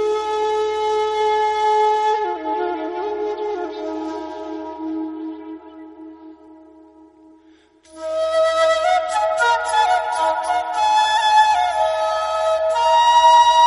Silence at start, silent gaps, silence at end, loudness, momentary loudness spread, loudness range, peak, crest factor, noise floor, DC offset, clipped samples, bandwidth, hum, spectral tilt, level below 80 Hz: 0 s; none; 0 s; -18 LUFS; 16 LU; 15 LU; -4 dBFS; 16 dB; -52 dBFS; under 0.1%; under 0.1%; 11 kHz; none; -1.5 dB/octave; -56 dBFS